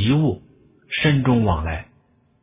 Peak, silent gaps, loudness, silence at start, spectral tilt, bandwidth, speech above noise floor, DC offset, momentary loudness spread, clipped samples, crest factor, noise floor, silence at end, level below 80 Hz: -6 dBFS; none; -20 LUFS; 0 s; -11 dB/octave; 3.8 kHz; 40 dB; under 0.1%; 13 LU; under 0.1%; 16 dB; -59 dBFS; 0.6 s; -36 dBFS